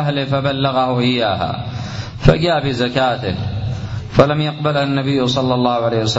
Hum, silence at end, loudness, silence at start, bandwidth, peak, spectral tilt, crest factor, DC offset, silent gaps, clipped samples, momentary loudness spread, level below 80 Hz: none; 0 s; -17 LUFS; 0 s; 7.8 kHz; 0 dBFS; -6.5 dB/octave; 16 dB; under 0.1%; none; under 0.1%; 9 LU; -34 dBFS